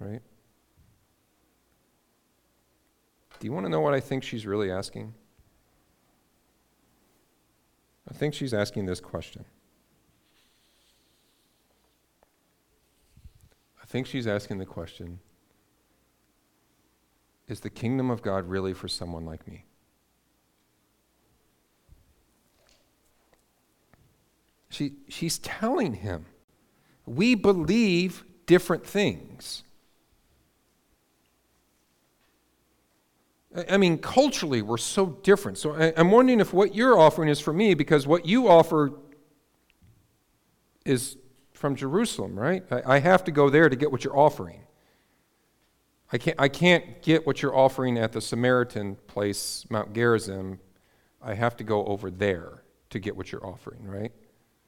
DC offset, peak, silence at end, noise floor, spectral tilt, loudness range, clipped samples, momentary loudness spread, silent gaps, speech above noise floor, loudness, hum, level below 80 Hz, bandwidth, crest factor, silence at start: under 0.1%; -6 dBFS; 0.6 s; -69 dBFS; -5.5 dB/octave; 17 LU; under 0.1%; 19 LU; 26.44-26.48 s; 45 dB; -25 LUFS; none; -58 dBFS; 17.5 kHz; 22 dB; 0 s